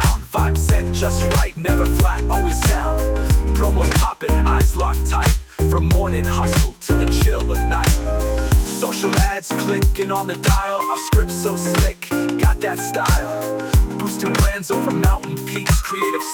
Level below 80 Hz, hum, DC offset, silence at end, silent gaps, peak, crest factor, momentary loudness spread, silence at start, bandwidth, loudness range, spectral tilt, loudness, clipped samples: -20 dBFS; none; under 0.1%; 0 s; none; -4 dBFS; 12 dB; 4 LU; 0 s; 19.5 kHz; 2 LU; -5 dB/octave; -19 LUFS; under 0.1%